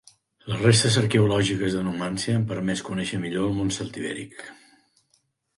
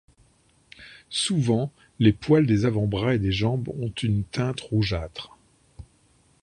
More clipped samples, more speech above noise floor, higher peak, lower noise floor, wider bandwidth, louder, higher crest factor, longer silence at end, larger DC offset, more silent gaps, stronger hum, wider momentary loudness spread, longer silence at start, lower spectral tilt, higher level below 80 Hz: neither; first, 45 dB vs 38 dB; about the same, -4 dBFS vs -6 dBFS; first, -69 dBFS vs -62 dBFS; about the same, 11.5 kHz vs 11 kHz; about the same, -24 LUFS vs -24 LUFS; about the same, 20 dB vs 20 dB; first, 1.05 s vs 0.6 s; neither; neither; neither; about the same, 15 LU vs 15 LU; second, 0.45 s vs 0.8 s; about the same, -5 dB/octave vs -6 dB/octave; second, -52 dBFS vs -46 dBFS